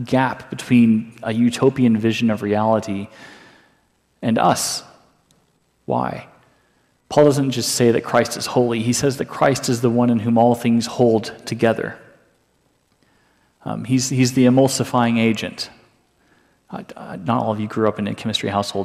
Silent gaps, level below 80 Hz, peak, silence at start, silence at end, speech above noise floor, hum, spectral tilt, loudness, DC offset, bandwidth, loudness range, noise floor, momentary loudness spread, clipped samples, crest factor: none; -58 dBFS; -2 dBFS; 0 s; 0 s; 45 dB; none; -5.5 dB/octave; -19 LUFS; under 0.1%; 15 kHz; 6 LU; -63 dBFS; 14 LU; under 0.1%; 16 dB